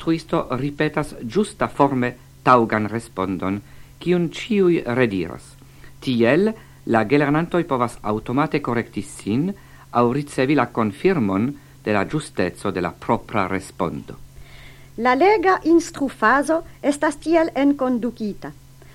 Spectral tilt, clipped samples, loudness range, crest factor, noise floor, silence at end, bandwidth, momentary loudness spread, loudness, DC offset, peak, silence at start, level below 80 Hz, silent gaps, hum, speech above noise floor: -6.5 dB/octave; under 0.1%; 4 LU; 20 dB; -42 dBFS; 0.45 s; 16 kHz; 11 LU; -21 LUFS; under 0.1%; 0 dBFS; 0 s; -48 dBFS; none; none; 22 dB